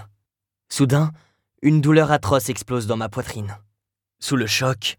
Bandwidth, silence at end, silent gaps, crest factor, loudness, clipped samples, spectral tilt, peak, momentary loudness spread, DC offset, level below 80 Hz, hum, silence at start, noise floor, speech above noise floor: 18.5 kHz; 0.05 s; none; 18 dB; -20 LUFS; under 0.1%; -5.5 dB/octave; -4 dBFS; 14 LU; under 0.1%; -52 dBFS; none; 0 s; -81 dBFS; 61 dB